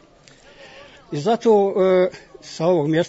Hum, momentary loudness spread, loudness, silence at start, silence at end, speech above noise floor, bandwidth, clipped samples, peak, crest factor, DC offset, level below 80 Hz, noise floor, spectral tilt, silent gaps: none; 16 LU; -19 LUFS; 0.65 s; 0 s; 31 dB; 8 kHz; under 0.1%; -6 dBFS; 14 dB; under 0.1%; -60 dBFS; -49 dBFS; -6.5 dB/octave; none